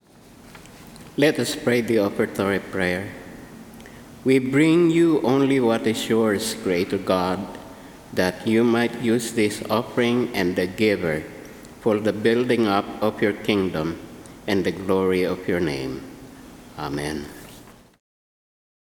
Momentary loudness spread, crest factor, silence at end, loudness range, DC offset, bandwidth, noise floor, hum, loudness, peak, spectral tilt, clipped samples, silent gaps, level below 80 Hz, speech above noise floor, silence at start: 22 LU; 18 dB; 1.25 s; 6 LU; under 0.1%; 19.5 kHz; -48 dBFS; none; -22 LUFS; -4 dBFS; -5.5 dB/octave; under 0.1%; none; -54 dBFS; 27 dB; 0.45 s